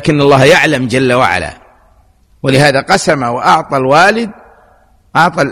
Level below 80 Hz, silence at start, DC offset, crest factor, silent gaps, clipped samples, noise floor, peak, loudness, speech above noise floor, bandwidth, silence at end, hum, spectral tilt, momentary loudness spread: -42 dBFS; 0 s; under 0.1%; 10 dB; none; 0.3%; -48 dBFS; 0 dBFS; -10 LUFS; 38 dB; 15.5 kHz; 0 s; none; -5 dB/octave; 10 LU